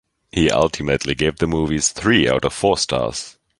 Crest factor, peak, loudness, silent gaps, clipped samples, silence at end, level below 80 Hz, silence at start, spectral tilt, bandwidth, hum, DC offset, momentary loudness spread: 18 dB; -2 dBFS; -18 LUFS; none; under 0.1%; 0.3 s; -38 dBFS; 0.35 s; -4 dB/octave; 11.5 kHz; none; under 0.1%; 9 LU